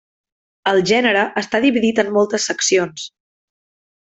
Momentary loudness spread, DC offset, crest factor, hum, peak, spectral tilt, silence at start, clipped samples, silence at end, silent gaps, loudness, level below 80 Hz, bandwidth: 10 LU; under 0.1%; 16 dB; none; -2 dBFS; -3 dB/octave; 0.65 s; under 0.1%; 1 s; none; -17 LUFS; -60 dBFS; 8.4 kHz